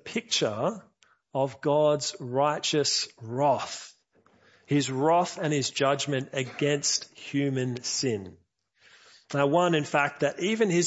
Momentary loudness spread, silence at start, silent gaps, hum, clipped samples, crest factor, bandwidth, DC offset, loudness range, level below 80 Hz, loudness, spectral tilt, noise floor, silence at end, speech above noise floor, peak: 9 LU; 0.05 s; none; none; under 0.1%; 18 dB; 8.2 kHz; under 0.1%; 2 LU; -74 dBFS; -27 LUFS; -4 dB/octave; -64 dBFS; 0 s; 37 dB; -10 dBFS